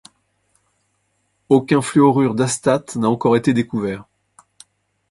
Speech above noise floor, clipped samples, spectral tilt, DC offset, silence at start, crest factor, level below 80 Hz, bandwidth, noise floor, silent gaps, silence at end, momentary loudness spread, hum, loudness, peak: 51 dB; under 0.1%; -6 dB/octave; under 0.1%; 1.5 s; 18 dB; -56 dBFS; 11.5 kHz; -67 dBFS; none; 1.1 s; 9 LU; none; -17 LUFS; 0 dBFS